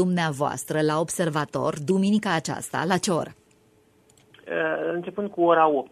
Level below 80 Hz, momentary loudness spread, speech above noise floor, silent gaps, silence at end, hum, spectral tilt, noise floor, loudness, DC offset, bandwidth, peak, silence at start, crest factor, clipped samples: -64 dBFS; 9 LU; 36 dB; none; 0.05 s; none; -5 dB/octave; -60 dBFS; -24 LUFS; under 0.1%; 14 kHz; -6 dBFS; 0 s; 18 dB; under 0.1%